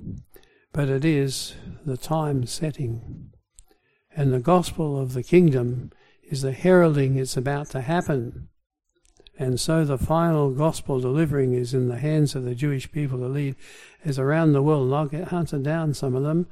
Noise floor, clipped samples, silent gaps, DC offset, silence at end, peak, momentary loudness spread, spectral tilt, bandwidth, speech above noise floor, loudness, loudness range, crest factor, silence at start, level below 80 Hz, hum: -61 dBFS; under 0.1%; none; under 0.1%; 0.05 s; -4 dBFS; 14 LU; -7 dB/octave; 15 kHz; 39 dB; -23 LUFS; 5 LU; 18 dB; 0 s; -46 dBFS; none